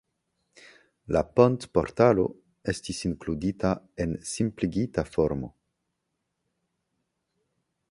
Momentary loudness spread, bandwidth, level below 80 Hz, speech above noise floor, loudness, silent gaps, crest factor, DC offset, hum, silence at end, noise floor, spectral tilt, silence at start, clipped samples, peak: 10 LU; 11.5 kHz; -48 dBFS; 55 dB; -27 LUFS; none; 24 dB; under 0.1%; none; 2.4 s; -80 dBFS; -6.5 dB/octave; 1.1 s; under 0.1%; -4 dBFS